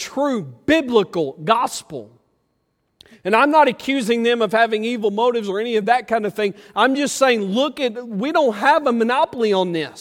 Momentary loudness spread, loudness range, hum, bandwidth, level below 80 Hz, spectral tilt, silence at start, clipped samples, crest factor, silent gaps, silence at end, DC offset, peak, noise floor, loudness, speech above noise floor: 8 LU; 2 LU; none; 16.5 kHz; -60 dBFS; -4 dB/octave; 0 s; under 0.1%; 18 dB; none; 0 s; under 0.1%; -2 dBFS; -69 dBFS; -18 LUFS; 51 dB